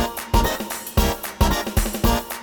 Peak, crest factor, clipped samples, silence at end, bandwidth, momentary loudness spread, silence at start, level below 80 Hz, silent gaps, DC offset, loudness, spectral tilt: -4 dBFS; 18 dB; under 0.1%; 0 s; over 20 kHz; 3 LU; 0 s; -26 dBFS; none; under 0.1%; -22 LUFS; -4.5 dB/octave